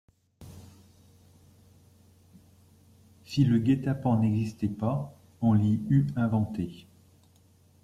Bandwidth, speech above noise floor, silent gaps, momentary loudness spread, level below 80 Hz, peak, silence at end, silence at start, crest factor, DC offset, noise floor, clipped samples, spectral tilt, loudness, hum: 12.5 kHz; 35 dB; none; 15 LU; -60 dBFS; -12 dBFS; 1.05 s; 0.4 s; 18 dB; under 0.1%; -61 dBFS; under 0.1%; -8.5 dB/octave; -27 LUFS; none